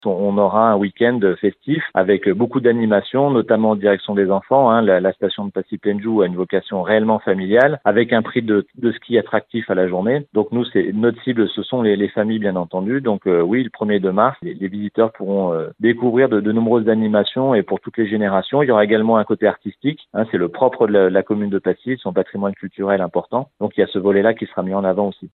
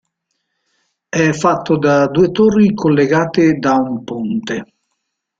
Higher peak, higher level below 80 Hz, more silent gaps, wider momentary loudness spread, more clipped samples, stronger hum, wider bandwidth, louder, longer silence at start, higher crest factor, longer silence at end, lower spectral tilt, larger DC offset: about the same, 0 dBFS vs -2 dBFS; second, -68 dBFS vs -52 dBFS; neither; about the same, 8 LU vs 10 LU; neither; neither; second, 4.2 kHz vs 7.8 kHz; second, -18 LUFS vs -14 LUFS; second, 0.05 s vs 1.15 s; about the same, 16 dB vs 14 dB; second, 0.05 s vs 0.75 s; first, -10 dB/octave vs -6.5 dB/octave; neither